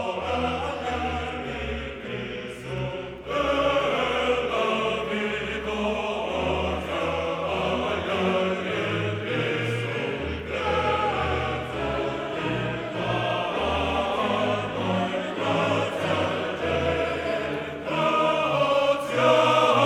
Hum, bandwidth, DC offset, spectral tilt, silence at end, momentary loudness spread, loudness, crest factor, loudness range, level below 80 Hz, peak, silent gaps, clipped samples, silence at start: none; 13.5 kHz; under 0.1%; -5.5 dB/octave; 0 s; 8 LU; -26 LUFS; 20 dB; 2 LU; -44 dBFS; -6 dBFS; none; under 0.1%; 0 s